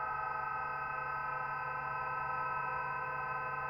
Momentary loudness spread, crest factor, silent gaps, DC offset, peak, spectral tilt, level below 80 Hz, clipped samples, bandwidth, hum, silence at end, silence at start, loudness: 2 LU; 12 dB; none; under 0.1%; -26 dBFS; -6.5 dB/octave; -64 dBFS; under 0.1%; 16.5 kHz; none; 0 s; 0 s; -37 LUFS